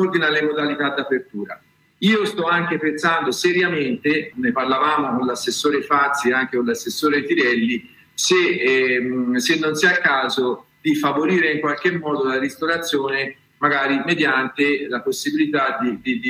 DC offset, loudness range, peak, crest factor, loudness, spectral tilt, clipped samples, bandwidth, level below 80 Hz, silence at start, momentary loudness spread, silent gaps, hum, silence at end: under 0.1%; 2 LU; -2 dBFS; 16 dB; -19 LUFS; -4 dB/octave; under 0.1%; 16 kHz; -64 dBFS; 0 s; 6 LU; none; none; 0 s